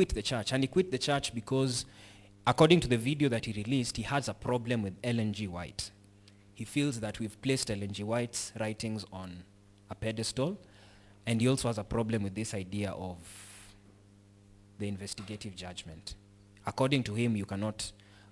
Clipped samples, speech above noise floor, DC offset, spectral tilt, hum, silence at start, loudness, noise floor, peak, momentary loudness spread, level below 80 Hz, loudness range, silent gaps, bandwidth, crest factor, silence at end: under 0.1%; 27 dB; under 0.1%; -5 dB/octave; none; 0 s; -33 LUFS; -59 dBFS; -10 dBFS; 16 LU; -54 dBFS; 11 LU; none; 12 kHz; 24 dB; 0.15 s